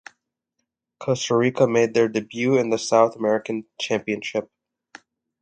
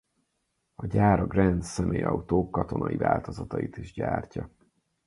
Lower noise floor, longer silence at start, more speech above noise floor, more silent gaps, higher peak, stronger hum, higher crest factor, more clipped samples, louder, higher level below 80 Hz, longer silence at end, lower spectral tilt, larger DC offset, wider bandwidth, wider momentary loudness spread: about the same, -79 dBFS vs -77 dBFS; first, 1 s vs 0.8 s; first, 58 dB vs 50 dB; neither; about the same, -4 dBFS vs -6 dBFS; neither; about the same, 20 dB vs 22 dB; neither; first, -22 LUFS vs -27 LUFS; second, -68 dBFS vs -44 dBFS; first, 0.95 s vs 0.6 s; second, -5 dB/octave vs -8 dB/octave; neither; second, 9 kHz vs 11.5 kHz; second, 10 LU vs 13 LU